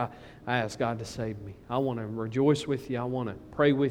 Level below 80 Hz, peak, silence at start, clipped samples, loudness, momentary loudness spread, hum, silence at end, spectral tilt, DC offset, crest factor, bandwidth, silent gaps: -58 dBFS; -10 dBFS; 0 s; under 0.1%; -30 LUFS; 11 LU; none; 0 s; -6.5 dB/octave; under 0.1%; 18 dB; 14 kHz; none